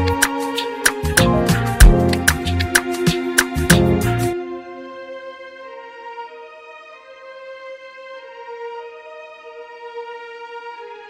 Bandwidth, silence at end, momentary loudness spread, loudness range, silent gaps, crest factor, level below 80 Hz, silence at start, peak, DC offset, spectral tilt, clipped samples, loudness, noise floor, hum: 16 kHz; 0 s; 23 LU; 19 LU; none; 20 dB; -24 dBFS; 0 s; 0 dBFS; under 0.1%; -4.5 dB/octave; under 0.1%; -17 LUFS; -40 dBFS; none